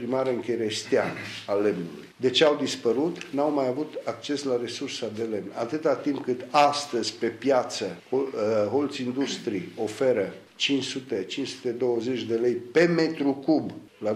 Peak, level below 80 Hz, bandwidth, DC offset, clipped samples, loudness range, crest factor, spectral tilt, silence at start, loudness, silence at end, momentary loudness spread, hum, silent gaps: -6 dBFS; -74 dBFS; 14 kHz; under 0.1%; under 0.1%; 3 LU; 20 dB; -4.5 dB/octave; 0 s; -26 LUFS; 0 s; 9 LU; none; none